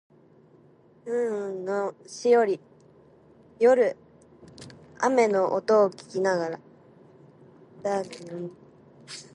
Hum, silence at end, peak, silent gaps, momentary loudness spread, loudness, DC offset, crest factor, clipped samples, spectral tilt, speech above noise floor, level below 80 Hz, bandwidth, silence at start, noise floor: none; 0.1 s; -8 dBFS; none; 21 LU; -25 LUFS; under 0.1%; 20 dB; under 0.1%; -5 dB/octave; 32 dB; -74 dBFS; 11 kHz; 1.05 s; -57 dBFS